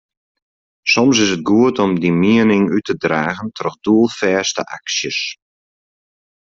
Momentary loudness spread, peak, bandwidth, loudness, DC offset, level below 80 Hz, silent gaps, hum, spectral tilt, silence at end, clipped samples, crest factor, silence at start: 10 LU; -2 dBFS; 7.8 kHz; -16 LUFS; under 0.1%; -56 dBFS; none; none; -4.5 dB/octave; 1.1 s; under 0.1%; 14 dB; 0.85 s